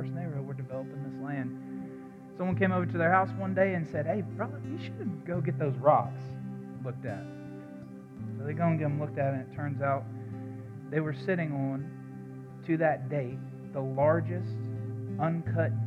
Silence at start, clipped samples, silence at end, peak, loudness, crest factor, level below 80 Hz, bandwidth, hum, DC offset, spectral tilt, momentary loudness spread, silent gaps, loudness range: 0 s; under 0.1%; 0 s; -10 dBFS; -32 LUFS; 20 dB; -68 dBFS; 6.6 kHz; none; under 0.1%; -9.5 dB/octave; 16 LU; none; 4 LU